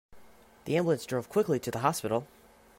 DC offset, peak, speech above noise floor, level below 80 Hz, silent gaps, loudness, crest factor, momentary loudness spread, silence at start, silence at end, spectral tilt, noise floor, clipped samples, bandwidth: under 0.1%; -12 dBFS; 26 dB; -66 dBFS; none; -30 LUFS; 20 dB; 5 LU; 0.1 s; 0.55 s; -5.5 dB/octave; -56 dBFS; under 0.1%; 16 kHz